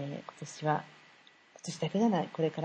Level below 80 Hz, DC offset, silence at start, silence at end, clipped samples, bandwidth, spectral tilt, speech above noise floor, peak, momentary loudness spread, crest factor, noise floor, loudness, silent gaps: -80 dBFS; under 0.1%; 0 s; 0 s; under 0.1%; 9.8 kHz; -6 dB/octave; 29 dB; -16 dBFS; 16 LU; 18 dB; -60 dBFS; -33 LUFS; none